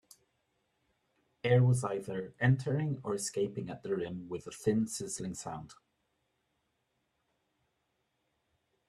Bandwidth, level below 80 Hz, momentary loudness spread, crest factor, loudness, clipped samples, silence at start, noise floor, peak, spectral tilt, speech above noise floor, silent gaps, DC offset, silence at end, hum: 12.5 kHz; -70 dBFS; 14 LU; 22 dB; -33 LUFS; under 0.1%; 1.45 s; -80 dBFS; -14 dBFS; -6 dB/octave; 48 dB; none; under 0.1%; 3.15 s; none